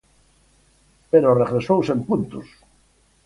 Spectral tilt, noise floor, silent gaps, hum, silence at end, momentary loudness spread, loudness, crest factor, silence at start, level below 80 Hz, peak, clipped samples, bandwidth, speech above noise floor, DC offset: -8.5 dB/octave; -59 dBFS; none; none; 0.85 s; 12 LU; -19 LUFS; 20 dB; 1.15 s; -54 dBFS; -4 dBFS; under 0.1%; 11 kHz; 40 dB; under 0.1%